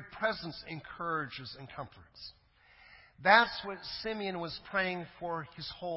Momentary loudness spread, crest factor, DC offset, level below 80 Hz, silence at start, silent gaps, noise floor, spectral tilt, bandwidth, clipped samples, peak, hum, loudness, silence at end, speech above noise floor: 22 LU; 26 dB; under 0.1%; -64 dBFS; 0 s; none; -61 dBFS; -7.5 dB/octave; 5.8 kHz; under 0.1%; -8 dBFS; none; -33 LUFS; 0 s; 27 dB